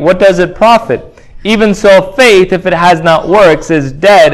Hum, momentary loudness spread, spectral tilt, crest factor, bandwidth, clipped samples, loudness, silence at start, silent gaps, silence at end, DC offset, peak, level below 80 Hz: none; 8 LU; -5 dB/octave; 6 dB; 16 kHz; 6%; -7 LUFS; 0 s; none; 0 s; under 0.1%; 0 dBFS; -34 dBFS